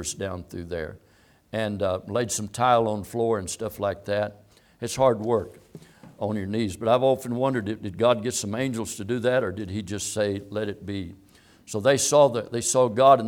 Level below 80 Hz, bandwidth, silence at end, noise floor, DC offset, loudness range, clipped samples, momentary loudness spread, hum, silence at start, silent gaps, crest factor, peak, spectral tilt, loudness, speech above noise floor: -58 dBFS; 18 kHz; 0 s; -48 dBFS; under 0.1%; 3 LU; under 0.1%; 13 LU; none; 0 s; none; 22 dB; -4 dBFS; -4.5 dB/octave; -25 LUFS; 23 dB